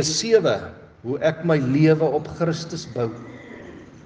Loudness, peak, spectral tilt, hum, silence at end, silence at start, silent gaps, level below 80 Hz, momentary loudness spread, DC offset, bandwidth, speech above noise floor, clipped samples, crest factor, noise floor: -21 LUFS; -4 dBFS; -5.5 dB/octave; none; 0.05 s; 0 s; none; -58 dBFS; 22 LU; under 0.1%; 9.8 kHz; 20 dB; under 0.1%; 18 dB; -41 dBFS